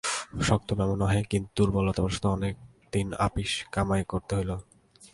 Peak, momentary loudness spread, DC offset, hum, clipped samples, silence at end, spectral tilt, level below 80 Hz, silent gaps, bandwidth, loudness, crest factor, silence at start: -8 dBFS; 7 LU; under 0.1%; none; under 0.1%; 0.05 s; -5.5 dB/octave; -42 dBFS; none; 11.5 kHz; -28 LUFS; 20 dB; 0.05 s